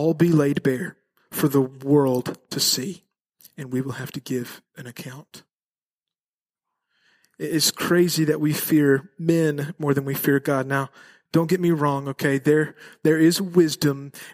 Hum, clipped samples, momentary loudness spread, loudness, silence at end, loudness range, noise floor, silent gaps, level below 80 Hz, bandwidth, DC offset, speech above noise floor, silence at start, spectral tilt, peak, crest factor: none; under 0.1%; 16 LU; -22 LUFS; 0 s; 12 LU; under -90 dBFS; 3.21-3.25 s, 5.55-5.71 s, 5.78-6.01 s, 6.20-6.46 s; -66 dBFS; 15.5 kHz; under 0.1%; over 68 dB; 0 s; -5 dB/octave; -6 dBFS; 18 dB